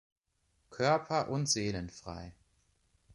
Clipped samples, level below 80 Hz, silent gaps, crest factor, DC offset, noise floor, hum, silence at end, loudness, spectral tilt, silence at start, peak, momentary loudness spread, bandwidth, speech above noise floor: under 0.1%; -60 dBFS; none; 20 dB; under 0.1%; -76 dBFS; none; 0.85 s; -32 LUFS; -4 dB/octave; 0.7 s; -16 dBFS; 18 LU; 11.5 kHz; 43 dB